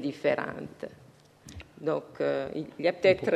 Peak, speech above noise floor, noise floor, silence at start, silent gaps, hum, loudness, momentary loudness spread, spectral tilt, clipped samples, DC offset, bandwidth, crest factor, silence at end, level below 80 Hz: -10 dBFS; 25 dB; -53 dBFS; 0 s; none; none; -30 LUFS; 20 LU; -6 dB/octave; under 0.1%; under 0.1%; 12 kHz; 20 dB; 0 s; -62 dBFS